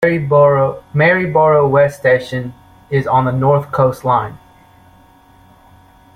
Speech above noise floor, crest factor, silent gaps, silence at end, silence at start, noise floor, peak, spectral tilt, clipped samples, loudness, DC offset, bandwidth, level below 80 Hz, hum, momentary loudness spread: 33 dB; 14 dB; none; 1.8 s; 0 s; -46 dBFS; -2 dBFS; -8 dB/octave; under 0.1%; -14 LUFS; under 0.1%; 14.5 kHz; -48 dBFS; none; 9 LU